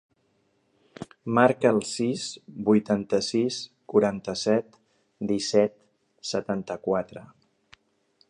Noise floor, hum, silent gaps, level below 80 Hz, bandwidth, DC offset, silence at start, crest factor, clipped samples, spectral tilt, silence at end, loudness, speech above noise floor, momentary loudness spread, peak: -69 dBFS; none; none; -64 dBFS; 11 kHz; under 0.1%; 1 s; 24 dB; under 0.1%; -5 dB/octave; 1.05 s; -26 LUFS; 44 dB; 14 LU; -4 dBFS